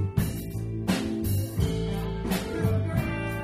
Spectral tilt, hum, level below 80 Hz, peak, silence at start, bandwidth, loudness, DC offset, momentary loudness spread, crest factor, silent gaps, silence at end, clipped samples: -6.5 dB/octave; none; -38 dBFS; -12 dBFS; 0 s; 16 kHz; -29 LUFS; under 0.1%; 4 LU; 16 dB; none; 0 s; under 0.1%